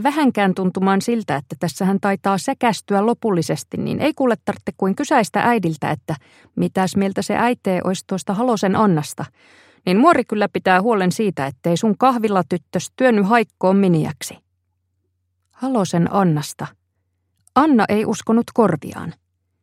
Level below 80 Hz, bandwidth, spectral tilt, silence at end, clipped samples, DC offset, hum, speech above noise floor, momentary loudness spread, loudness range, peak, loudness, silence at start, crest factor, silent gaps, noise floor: -62 dBFS; 15.5 kHz; -6 dB/octave; 0.5 s; under 0.1%; under 0.1%; none; 52 dB; 11 LU; 3 LU; 0 dBFS; -19 LUFS; 0 s; 18 dB; none; -70 dBFS